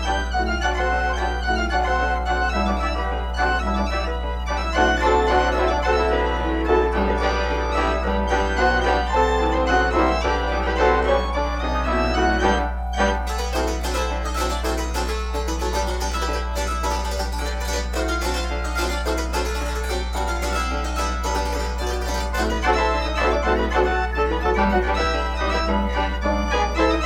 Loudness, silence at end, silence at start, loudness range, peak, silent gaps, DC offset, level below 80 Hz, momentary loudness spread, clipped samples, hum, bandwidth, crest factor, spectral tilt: -22 LUFS; 0 s; 0 s; 4 LU; -4 dBFS; none; under 0.1%; -26 dBFS; 6 LU; under 0.1%; 60 Hz at -30 dBFS; 15.5 kHz; 16 dB; -5 dB/octave